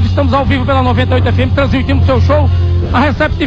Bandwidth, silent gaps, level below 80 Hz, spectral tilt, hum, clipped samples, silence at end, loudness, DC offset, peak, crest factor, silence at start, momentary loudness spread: 6.4 kHz; none; -20 dBFS; -8 dB/octave; none; under 0.1%; 0 s; -11 LUFS; under 0.1%; -2 dBFS; 8 dB; 0 s; 2 LU